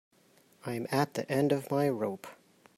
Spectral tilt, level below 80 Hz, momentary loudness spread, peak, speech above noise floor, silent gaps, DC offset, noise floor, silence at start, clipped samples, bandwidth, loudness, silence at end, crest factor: -6.5 dB/octave; -74 dBFS; 16 LU; -14 dBFS; 34 dB; none; under 0.1%; -64 dBFS; 0.65 s; under 0.1%; 16 kHz; -31 LUFS; 0.45 s; 20 dB